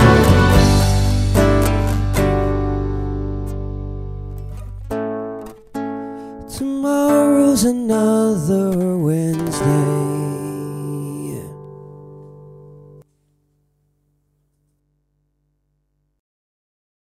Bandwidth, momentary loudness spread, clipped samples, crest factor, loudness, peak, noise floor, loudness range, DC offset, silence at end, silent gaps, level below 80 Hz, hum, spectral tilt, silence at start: 15.5 kHz; 19 LU; under 0.1%; 18 dB; -18 LUFS; 0 dBFS; -68 dBFS; 13 LU; under 0.1%; 4.1 s; none; -28 dBFS; 50 Hz at -45 dBFS; -6.5 dB/octave; 0 s